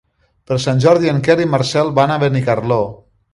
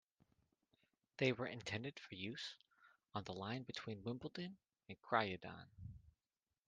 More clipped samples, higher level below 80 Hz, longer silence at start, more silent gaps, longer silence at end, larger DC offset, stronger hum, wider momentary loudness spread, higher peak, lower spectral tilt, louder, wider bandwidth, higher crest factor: neither; first, -48 dBFS vs -76 dBFS; second, 0.5 s vs 1.2 s; neither; second, 0.4 s vs 0.6 s; neither; neither; second, 7 LU vs 19 LU; first, 0 dBFS vs -20 dBFS; about the same, -6.5 dB/octave vs -5.5 dB/octave; first, -15 LUFS vs -45 LUFS; first, 11.5 kHz vs 9.6 kHz; second, 14 dB vs 26 dB